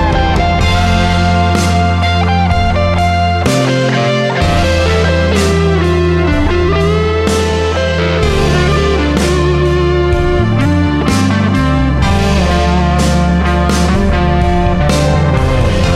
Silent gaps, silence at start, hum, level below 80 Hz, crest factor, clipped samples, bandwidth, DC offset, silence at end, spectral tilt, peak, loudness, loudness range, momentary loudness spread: none; 0 s; none; -18 dBFS; 10 dB; under 0.1%; 13 kHz; under 0.1%; 0 s; -6 dB/octave; 0 dBFS; -12 LUFS; 0 LU; 1 LU